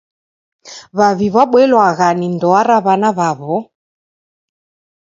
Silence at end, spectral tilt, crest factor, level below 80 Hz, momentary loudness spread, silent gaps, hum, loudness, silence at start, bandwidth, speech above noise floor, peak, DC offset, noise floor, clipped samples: 1.45 s; -6 dB/octave; 14 dB; -58 dBFS; 10 LU; none; none; -13 LUFS; 0.65 s; 7.8 kHz; over 78 dB; 0 dBFS; under 0.1%; under -90 dBFS; under 0.1%